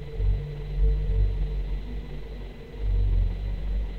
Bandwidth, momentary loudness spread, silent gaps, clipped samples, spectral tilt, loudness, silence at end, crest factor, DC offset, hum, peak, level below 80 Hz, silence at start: 4.3 kHz; 12 LU; none; under 0.1%; -9 dB/octave; -30 LUFS; 0 s; 12 dB; under 0.1%; none; -14 dBFS; -26 dBFS; 0 s